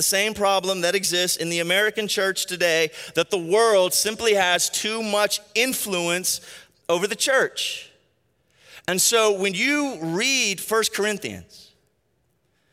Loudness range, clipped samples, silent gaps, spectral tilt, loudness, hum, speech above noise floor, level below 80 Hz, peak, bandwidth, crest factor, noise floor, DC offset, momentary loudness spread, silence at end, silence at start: 3 LU; under 0.1%; none; -1.5 dB/octave; -21 LUFS; none; 47 dB; -66 dBFS; -6 dBFS; 16 kHz; 18 dB; -69 dBFS; under 0.1%; 8 LU; 1.1 s; 0 s